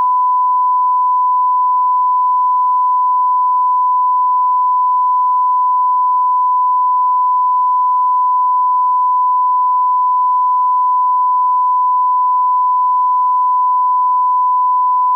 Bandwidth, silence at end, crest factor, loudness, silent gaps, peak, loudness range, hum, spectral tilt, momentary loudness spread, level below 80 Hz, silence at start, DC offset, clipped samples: 1.2 kHz; 0 s; 4 dB; -13 LUFS; none; -10 dBFS; 0 LU; none; 0 dB/octave; 0 LU; under -90 dBFS; 0 s; under 0.1%; under 0.1%